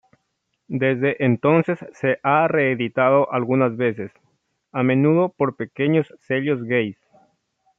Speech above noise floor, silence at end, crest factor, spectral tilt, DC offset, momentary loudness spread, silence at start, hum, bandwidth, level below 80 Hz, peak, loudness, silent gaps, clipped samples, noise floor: 54 dB; 0.85 s; 16 dB; -9 dB/octave; under 0.1%; 8 LU; 0.7 s; none; 6.6 kHz; -68 dBFS; -4 dBFS; -20 LUFS; none; under 0.1%; -74 dBFS